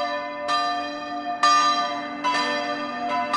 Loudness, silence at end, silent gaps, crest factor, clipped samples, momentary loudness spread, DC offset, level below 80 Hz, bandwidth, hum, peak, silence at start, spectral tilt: -23 LUFS; 0 s; none; 16 dB; under 0.1%; 10 LU; under 0.1%; -64 dBFS; 11.5 kHz; none; -8 dBFS; 0 s; -1.5 dB/octave